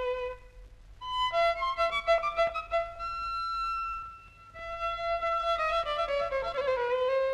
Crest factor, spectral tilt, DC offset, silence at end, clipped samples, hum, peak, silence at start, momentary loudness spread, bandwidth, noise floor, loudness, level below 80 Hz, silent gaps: 14 dB; -2.5 dB/octave; under 0.1%; 0 s; under 0.1%; none; -16 dBFS; 0 s; 13 LU; 11.5 kHz; -50 dBFS; -30 LUFS; -52 dBFS; none